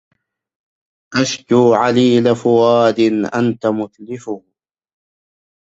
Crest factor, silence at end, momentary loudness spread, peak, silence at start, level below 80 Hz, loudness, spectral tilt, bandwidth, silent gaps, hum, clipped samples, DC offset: 16 dB; 1.3 s; 15 LU; 0 dBFS; 1.1 s; -58 dBFS; -14 LUFS; -5.5 dB/octave; 8 kHz; none; none; under 0.1%; under 0.1%